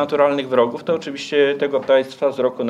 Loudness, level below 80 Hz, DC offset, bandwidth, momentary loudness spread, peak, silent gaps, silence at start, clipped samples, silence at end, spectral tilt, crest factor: -19 LUFS; -70 dBFS; under 0.1%; 10.5 kHz; 6 LU; -2 dBFS; none; 0 s; under 0.1%; 0 s; -5 dB/octave; 16 dB